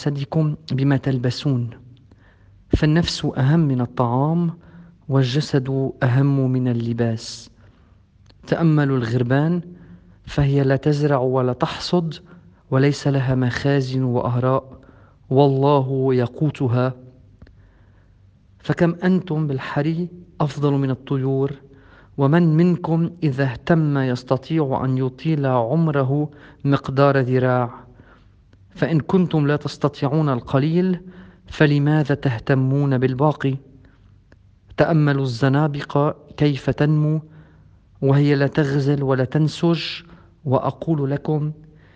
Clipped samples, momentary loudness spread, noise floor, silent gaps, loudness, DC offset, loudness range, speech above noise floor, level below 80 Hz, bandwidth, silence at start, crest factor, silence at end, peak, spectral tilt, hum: under 0.1%; 8 LU; -52 dBFS; none; -20 LUFS; under 0.1%; 3 LU; 34 dB; -46 dBFS; 8.2 kHz; 0 s; 20 dB; 0.4 s; 0 dBFS; -8 dB/octave; none